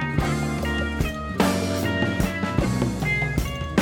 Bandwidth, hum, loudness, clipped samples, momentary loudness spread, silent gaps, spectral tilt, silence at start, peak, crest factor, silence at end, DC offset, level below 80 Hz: 17 kHz; none; -24 LUFS; under 0.1%; 3 LU; none; -5.5 dB/octave; 0 s; -6 dBFS; 16 dB; 0 s; under 0.1%; -34 dBFS